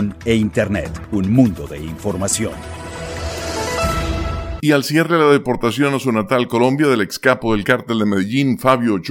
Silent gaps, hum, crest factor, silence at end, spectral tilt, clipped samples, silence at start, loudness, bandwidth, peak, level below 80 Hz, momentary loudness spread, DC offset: none; none; 16 dB; 0 s; -5.5 dB/octave; under 0.1%; 0 s; -17 LUFS; 17 kHz; 0 dBFS; -34 dBFS; 11 LU; under 0.1%